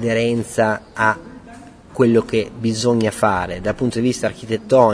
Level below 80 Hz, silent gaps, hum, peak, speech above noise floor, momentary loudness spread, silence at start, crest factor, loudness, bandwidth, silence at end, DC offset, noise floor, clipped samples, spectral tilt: -46 dBFS; none; none; 0 dBFS; 23 dB; 9 LU; 0 s; 18 dB; -19 LUFS; 11 kHz; 0 s; under 0.1%; -40 dBFS; under 0.1%; -5.5 dB/octave